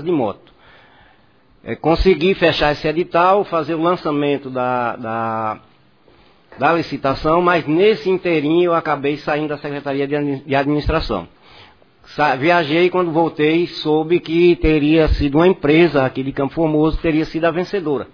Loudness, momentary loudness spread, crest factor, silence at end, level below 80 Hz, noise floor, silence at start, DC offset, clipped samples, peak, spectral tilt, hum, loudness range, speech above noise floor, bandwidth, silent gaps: -17 LUFS; 8 LU; 16 dB; 0.05 s; -34 dBFS; -54 dBFS; 0 s; 0.1%; under 0.1%; 0 dBFS; -7.5 dB/octave; none; 6 LU; 37 dB; 5.4 kHz; none